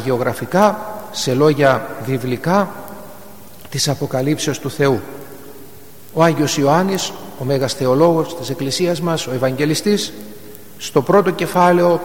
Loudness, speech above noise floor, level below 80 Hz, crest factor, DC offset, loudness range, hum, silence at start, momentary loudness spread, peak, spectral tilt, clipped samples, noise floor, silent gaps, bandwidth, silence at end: -17 LUFS; 25 dB; -52 dBFS; 18 dB; 1%; 4 LU; none; 0 s; 19 LU; 0 dBFS; -5 dB/octave; under 0.1%; -41 dBFS; none; 17.5 kHz; 0 s